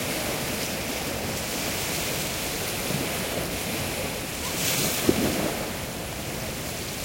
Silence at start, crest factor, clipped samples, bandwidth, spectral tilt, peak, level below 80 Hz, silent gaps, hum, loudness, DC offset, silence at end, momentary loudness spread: 0 s; 24 dB; under 0.1%; 16.5 kHz; -3 dB/octave; -4 dBFS; -46 dBFS; none; none; -27 LUFS; under 0.1%; 0 s; 8 LU